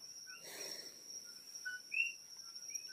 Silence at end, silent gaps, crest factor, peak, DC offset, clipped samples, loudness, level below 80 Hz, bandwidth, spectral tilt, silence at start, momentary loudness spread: 0 s; none; 22 dB; -24 dBFS; under 0.1%; under 0.1%; -44 LUFS; under -90 dBFS; 15.5 kHz; 1.5 dB/octave; 0 s; 12 LU